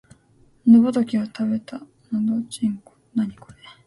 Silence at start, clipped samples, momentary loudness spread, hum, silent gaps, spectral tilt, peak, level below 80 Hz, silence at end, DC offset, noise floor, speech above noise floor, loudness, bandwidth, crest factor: 0.65 s; under 0.1%; 15 LU; none; none; -7 dB/octave; -4 dBFS; -62 dBFS; 0.55 s; under 0.1%; -57 dBFS; 36 dB; -21 LUFS; 11.5 kHz; 18 dB